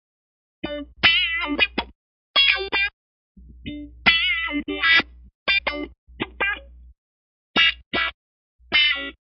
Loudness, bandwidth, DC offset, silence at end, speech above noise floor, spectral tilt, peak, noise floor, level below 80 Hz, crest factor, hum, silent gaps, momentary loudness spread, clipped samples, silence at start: -19 LUFS; 6 kHz; under 0.1%; 0.1 s; over 68 dB; -4 dB/octave; -2 dBFS; under -90 dBFS; -46 dBFS; 22 dB; none; 1.95-2.34 s, 2.93-3.35 s, 5.35-5.46 s, 5.98-6.07 s, 6.98-7.54 s, 7.86-7.91 s, 8.14-8.59 s; 19 LU; under 0.1%; 0.65 s